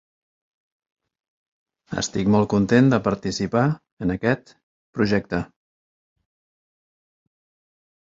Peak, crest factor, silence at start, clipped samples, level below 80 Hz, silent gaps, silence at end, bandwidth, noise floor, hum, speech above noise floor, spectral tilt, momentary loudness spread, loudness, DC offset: -4 dBFS; 20 dB; 1.9 s; under 0.1%; -50 dBFS; 3.92-3.97 s, 4.63-4.93 s; 2.75 s; 7.8 kHz; under -90 dBFS; none; over 69 dB; -6 dB/octave; 12 LU; -22 LUFS; under 0.1%